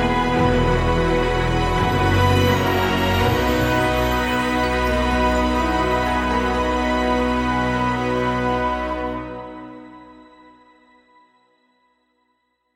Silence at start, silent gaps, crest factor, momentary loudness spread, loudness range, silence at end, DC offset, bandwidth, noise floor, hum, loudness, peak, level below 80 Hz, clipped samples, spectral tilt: 0 s; none; 16 dB; 7 LU; 9 LU; 2.6 s; under 0.1%; 16.5 kHz; -69 dBFS; none; -19 LUFS; -4 dBFS; -30 dBFS; under 0.1%; -6 dB/octave